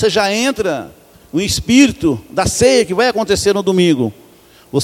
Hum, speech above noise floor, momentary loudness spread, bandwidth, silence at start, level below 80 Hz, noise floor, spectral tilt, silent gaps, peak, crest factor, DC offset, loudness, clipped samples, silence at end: none; 31 dB; 9 LU; 16.5 kHz; 0 s; -38 dBFS; -45 dBFS; -4 dB/octave; none; 0 dBFS; 14 dB; under 0.1%; -14 LUFS; under 0.1%; 0 s